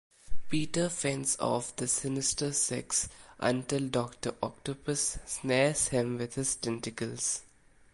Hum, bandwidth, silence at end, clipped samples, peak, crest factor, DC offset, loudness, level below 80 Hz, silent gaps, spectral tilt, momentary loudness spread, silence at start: none; 11.5 kHz; 0.5 s; under 0.1%; -12 dBFS; 18 dB; under 0.1%; -31 LUFS; -54 dBFS; none; -3.5 dB/octave; 8 LU; 0.25 s